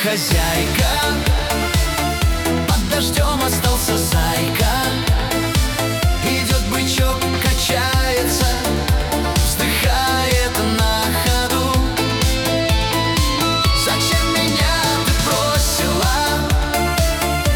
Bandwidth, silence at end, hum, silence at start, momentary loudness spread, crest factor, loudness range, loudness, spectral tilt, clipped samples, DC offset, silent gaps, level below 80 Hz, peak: over 20 kHz; 0 s; none; 0 s; 2 LU; 12 dB; 1 LU; -17 LUFS; -4 dB/octave; under 0.1%; under 0.1%; none; -22 dBFS; -4 dBFS